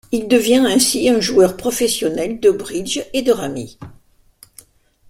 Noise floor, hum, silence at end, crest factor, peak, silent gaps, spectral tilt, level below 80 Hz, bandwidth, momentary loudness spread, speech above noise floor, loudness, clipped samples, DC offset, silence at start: -51 dBFS; none; 1.2 s; 18 dB; 0 dBFS; none; -3.5 dB/octave; -48 dBFS; 16.5 kHz; 9 LU; 35 dB; -16 LUFS; under 0.1%; under 0.1%; 0.1 s